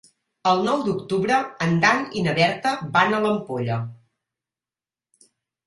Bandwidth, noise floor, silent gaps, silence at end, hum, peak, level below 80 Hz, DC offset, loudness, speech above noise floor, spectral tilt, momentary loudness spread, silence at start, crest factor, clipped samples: 11.5 kHz; under -90 dBFS; none; 1.7 s; none; -2 dBFS; -60 dBFS; under 0.1%; -21 LUFS; over 69 dB; -5.5 dB/octave; 7 LU; 0.45 s; 22 dB; under 0.1%